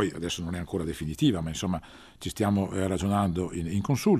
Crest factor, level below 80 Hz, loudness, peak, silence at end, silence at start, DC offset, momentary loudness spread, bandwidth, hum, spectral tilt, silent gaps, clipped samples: 16 dB; -50 dBFS; -29 LUFS; -10 dBFS; 0 s; 0 s; under 0.1%; 7 LU; 14.5 kHz; none; -6 dB/octave; none; under 0.1%